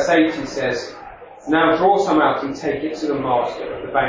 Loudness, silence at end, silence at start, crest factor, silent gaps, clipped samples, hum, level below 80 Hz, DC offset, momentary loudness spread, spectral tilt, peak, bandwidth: -19 LUFS; 0 s; 0 s; 16 dB; none; under 0.1%; none; -50 dBFS; under 0.1%; 15 LU; -5 dB/octave; -4 dBFS; 7.6 kHz